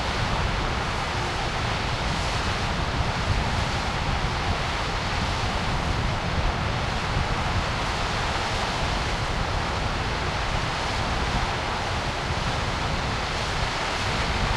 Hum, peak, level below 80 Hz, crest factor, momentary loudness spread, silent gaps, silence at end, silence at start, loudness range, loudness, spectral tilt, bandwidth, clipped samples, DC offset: none; -10 dBFS; -32 dBFS; 14 dB; 1 LU; none; 0 s; 0 s; 0 LU; -26 LUFS; -4.5 dB/octave; 13 kHz; under 0.1%; under 0.1%